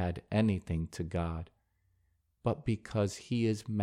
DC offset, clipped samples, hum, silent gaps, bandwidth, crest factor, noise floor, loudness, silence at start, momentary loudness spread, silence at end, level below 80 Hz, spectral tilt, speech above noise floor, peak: under 0.1%; under 0.1%; none; none; 12 kHz; 18 dB; -74 dBFS; -34 LUFS; 0 s; 7 LU; 0 s; -52 dBFS; -7 dB/octave; 42 dB; -16 dBFS